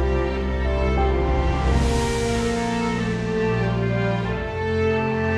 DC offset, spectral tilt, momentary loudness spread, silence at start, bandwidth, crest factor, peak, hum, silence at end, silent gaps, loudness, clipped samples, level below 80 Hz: under 0.1%; -6.5 dB/octave; 3 LU; 0 s; 11.5 kHz; 14 dB; -8 dBFS; none; 0 s; none; -22 LUFS; under 0.1%; -26 dBFS